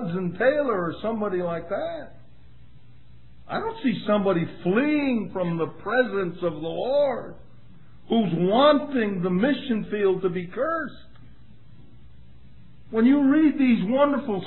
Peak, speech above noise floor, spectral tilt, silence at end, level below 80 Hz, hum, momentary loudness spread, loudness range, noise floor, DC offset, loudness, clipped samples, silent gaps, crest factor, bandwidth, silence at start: -6 dBFS; 29 dB; -10.5 dB/octave; 0 s; -56 dBFS; none; 11 LU; 6 LU; -52 dBFS; 0.8%; -24 LUFS; under 0.1%; none; 18 dB; 4.2 kHz; 0 s